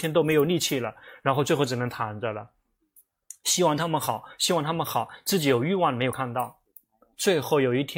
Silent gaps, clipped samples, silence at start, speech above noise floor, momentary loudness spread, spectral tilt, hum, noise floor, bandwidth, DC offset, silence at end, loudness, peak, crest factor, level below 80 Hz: none; under 0.1%; 0 s; 37 dB; 8 LU; -4 dB/octave; none; -62 dBFS; 17 kHz; under 0.1%; 0 s; -25 LUFS; -8 dBFS; 18 dB; -64 dBFS